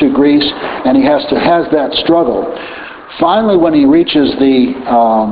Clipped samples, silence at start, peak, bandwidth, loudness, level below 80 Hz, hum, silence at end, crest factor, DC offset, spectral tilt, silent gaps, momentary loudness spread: under 0.1%; 0 s; 0 dBFS; 5 kHz; -11 LUFS; -42 dBFS; none; 0 s; 10 dB; under 0.1%; -3.5 dB/octave; none; 9 LU